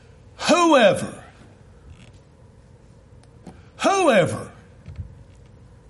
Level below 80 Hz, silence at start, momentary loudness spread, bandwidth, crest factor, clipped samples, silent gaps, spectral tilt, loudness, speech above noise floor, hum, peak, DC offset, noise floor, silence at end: -52 dBFS; 0.4 s; 26 LU; 11.5 kHz; 20 dB; under 0.1%; none; -4.5 dB/octave; -18 LUFS; 32 dB; none; -2 dBFS; under 0.1%; -49 dBFS; 0.85 s